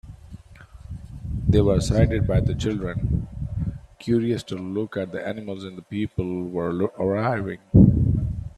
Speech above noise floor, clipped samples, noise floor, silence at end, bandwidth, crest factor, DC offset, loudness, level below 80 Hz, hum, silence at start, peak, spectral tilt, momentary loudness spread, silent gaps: 23 dB; under 0.1%; -45 dBFS; 0.1 s; 11.5 kHz; 22 dB; under 0.1%; -23 LUFS; -34 dBFS; none; 0.05 s; -2 dBFS; -8 dB/octave; 15 LU; none